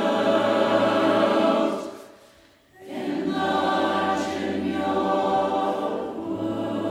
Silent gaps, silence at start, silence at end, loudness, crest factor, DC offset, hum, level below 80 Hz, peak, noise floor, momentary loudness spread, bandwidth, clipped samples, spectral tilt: none; 0 s; 0 s; -23 LUFS; 16 dB; under 0.1%; none; -66 dBFS; -8 dBFS; -55 dBFS; 10 LU; 15.5 kHz; under 0.1%; -5.5 dB/octave